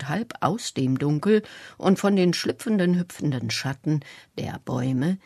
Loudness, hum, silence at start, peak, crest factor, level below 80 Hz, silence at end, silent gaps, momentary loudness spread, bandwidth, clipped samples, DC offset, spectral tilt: -25 LUFS; none; 0 s; -8 dBFS; 16 dB; -64 dBFS; 0.1 s; none; 10 LU; 13.5 kHz; under 0.1%; under 0.1%; -6 dB/octave